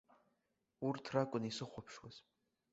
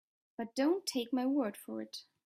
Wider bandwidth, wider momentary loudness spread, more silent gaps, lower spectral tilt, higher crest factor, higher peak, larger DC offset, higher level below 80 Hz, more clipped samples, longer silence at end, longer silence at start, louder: second, 8 kHz vs 15.5 kHz; first, 18 LU vs 13 LU; neither; first, -5 dB/octave vs -3.5 dB/octave; first, 24 dB vs 14 dB; about the same, -22 dBFS vs -22 dBFS; neither; first, -78 dBFS vs -84 dBFS; neither; first, 0.5 s vs 0.25 s; first, 0.8 s vs 0.4 s; second, -42 LUFS vs -35 LUFS